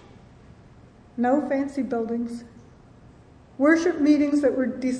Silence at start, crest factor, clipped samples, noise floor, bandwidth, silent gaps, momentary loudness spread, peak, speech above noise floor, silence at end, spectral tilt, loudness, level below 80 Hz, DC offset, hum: 1.15 s; 20 dB; under 0.1%; -50 dBFS; 9.8 kHz; none; 11 LU; -6 dBFS; 28 dB; 0 s; -5.5 dB/octave; -23 LUFS; -58 dBFS; under 0.1%; none